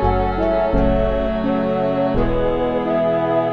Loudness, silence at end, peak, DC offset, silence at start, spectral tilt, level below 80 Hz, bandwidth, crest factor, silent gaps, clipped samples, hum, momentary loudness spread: -19 LUFS; 0 s; -4 dBFS; 0.7%; 0 s; -9.5 dB/octave; -26 dBFS; 5.8 kHz; 14 dB; none; under 0.1%; none; 2 LU